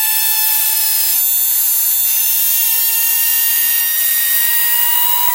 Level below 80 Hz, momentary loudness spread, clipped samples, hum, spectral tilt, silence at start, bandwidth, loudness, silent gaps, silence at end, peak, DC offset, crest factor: -70 dBFS; 1 LU; under 0.1%; none; 4.5 dB/octave; 0 s; 16.5 kHz; -10 LUFS; none; 0 s; -2 dBFS; under 0.1%; 12 dB